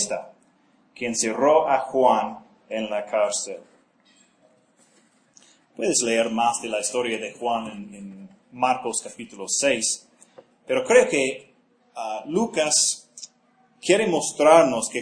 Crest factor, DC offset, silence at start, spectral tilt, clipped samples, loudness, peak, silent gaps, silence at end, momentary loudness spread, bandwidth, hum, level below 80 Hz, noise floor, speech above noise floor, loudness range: 24 dB; under 0.1%; 0 s; -2.5 dB/octave; under 0.1%; -22 LUFS; 0 dBFS; none; 0 s; 20 LU; 10.5 kHz; none; -70 dBFS; -61 dBFS; 39 dB; 5 LU